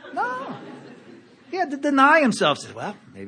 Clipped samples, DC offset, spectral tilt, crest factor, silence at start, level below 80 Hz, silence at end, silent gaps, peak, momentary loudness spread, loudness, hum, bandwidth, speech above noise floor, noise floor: under 0.1%; under 0.1%; -4 dB/octave; 20 dB; 0.05 s; -74 dBFS; 0 s; none; -2 dBFS; 20 LU; -20 LUFS; none; 10 kHz; 27 dB; -48 dBFS